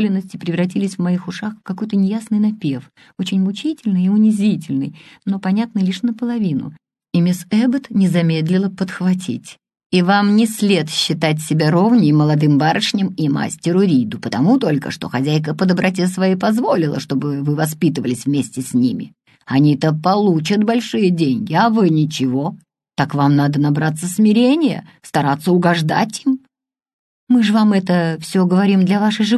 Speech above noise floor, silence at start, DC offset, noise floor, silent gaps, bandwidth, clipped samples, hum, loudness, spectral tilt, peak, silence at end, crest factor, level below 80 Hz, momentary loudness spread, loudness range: 50 dB; 0 s; under 0.1%; -66 dBFS; 9.86-9.90 s, 26.93-27.27 s; 12.5 kHz; under 0.1%; none; -17 LUFS; -6.5 dB/octave; -2 dBFS; 0 s; 14 dB; -60 dBFS; 8 LU; 4 LU